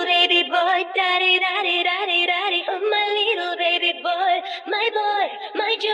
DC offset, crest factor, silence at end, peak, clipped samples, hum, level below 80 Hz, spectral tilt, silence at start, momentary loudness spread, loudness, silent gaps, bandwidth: under 0.1%; 16 dB; 0 s; -4 dBFS; under 0.1%; none; -82 dBFS; 0 dB/octave; 0 s; 6 LU; -19 LUFS; none; 10.5 kHz